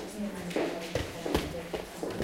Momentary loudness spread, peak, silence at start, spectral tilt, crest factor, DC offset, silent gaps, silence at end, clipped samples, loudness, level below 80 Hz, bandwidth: 5 LU; -12 dBFS; 0 s; -5 dB/octave; 22 dB; under 0.1%; none; 0 s; under 0.1%; -35 LUFS; -48 dBFS; 17 kHz